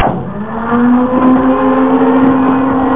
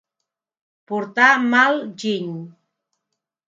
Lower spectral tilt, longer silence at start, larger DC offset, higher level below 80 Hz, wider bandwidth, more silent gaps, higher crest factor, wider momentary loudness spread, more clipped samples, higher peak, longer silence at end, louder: first, -11.5 dB/octave vs -4.5 dB/octave; second, 0 s vs 0.9 s; first, 3% vs under 0.1%; first, -36 dBFS vs -76 dBFS; second, 3.8 kHz vs 7.8 kHz; neither; second, 10 dB vs 22 dB; second, 8 LU vs 15 LU; neither; about the same, 0 dBFS vs 0 dBFS; second, 0 s vs 0.95 s; first, -11 LUFS vs -18 LUFS